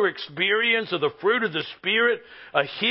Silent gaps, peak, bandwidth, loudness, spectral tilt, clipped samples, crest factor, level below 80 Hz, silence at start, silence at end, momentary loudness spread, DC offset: none; -6 dBFS; 5.8 kHz; -23 LUFS; -8 dB/octave; under 0.1%; 18 dB; -72 dBFS; 0 s; 0 s; 6 LU; under 0.1%